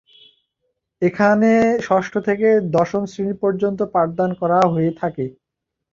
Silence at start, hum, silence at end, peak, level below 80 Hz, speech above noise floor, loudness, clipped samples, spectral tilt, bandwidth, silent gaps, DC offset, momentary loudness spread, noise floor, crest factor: 1 s; none; 0.6 s; -2 dBFS; -56 dBFS; 63 dB; -18 LUFS; under 0.1%; -7.5 dB/octave; 7.4 kHz; none; under 0.1%; 9 LU; -81 dBFS; 16 dB